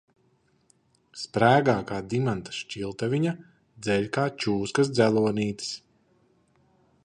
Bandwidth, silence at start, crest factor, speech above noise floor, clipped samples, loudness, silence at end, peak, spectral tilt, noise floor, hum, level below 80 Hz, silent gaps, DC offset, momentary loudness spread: 10.5 kHz; 1.15 s; 22 dB; 41 dB; under 0.1%; -26 LUFS; 1.25 s; -6 dBFS; -6 dB/octave; -67 dBFS; none; -60 dBFS; none; under 0.1%; 14 LU